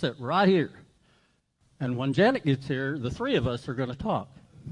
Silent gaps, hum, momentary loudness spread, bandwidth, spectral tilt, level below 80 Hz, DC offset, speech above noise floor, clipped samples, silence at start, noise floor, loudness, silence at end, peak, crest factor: none; none; 11 LU; 11 kHz; -7.5 dB/octave; -54 dBFS; under 0.1%; 41 dB; under 0.1%; 0 s; -68 dBFS; -27 LUFS; 0 s; -10 dBFS; 18 dB